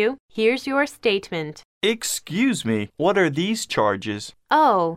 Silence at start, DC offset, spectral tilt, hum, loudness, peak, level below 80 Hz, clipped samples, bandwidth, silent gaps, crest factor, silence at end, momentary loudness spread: 0 s; under 0.1%; -4 dB/octave; none; -22 LUFS; -6 dBFS; -62 dBFS; under 0.1%; 16 kHz; 0.20-0.29 s, 1.65-1.81 s; 16 dB; 0 s; 10 LU